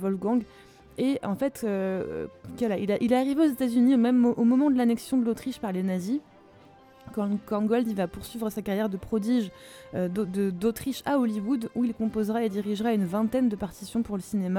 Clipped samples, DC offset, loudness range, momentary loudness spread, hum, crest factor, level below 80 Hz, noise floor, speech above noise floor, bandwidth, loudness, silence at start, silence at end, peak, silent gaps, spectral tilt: under 0.1%; under 0.1%; 6 LU; 10 LU; none; 16 dB; -58 dBFS; -53 dBFS; 27 dB; 17 kHz; -27 LUFS; 0 s; 0 s; -10 dBFS; none; -7 dB/octave